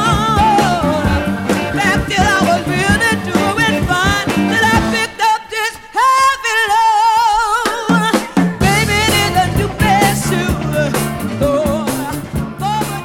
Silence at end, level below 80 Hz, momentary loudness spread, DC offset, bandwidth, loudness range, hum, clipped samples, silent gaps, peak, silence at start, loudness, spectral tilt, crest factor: 0 s; -30 dBFS; 7 LU; under 0.1%; 18 kHz; 2 LU; none; under 0.1%; none; 0 dBFS; 0 s; -14 LUFS; -4.5 dB/octave; 14 dB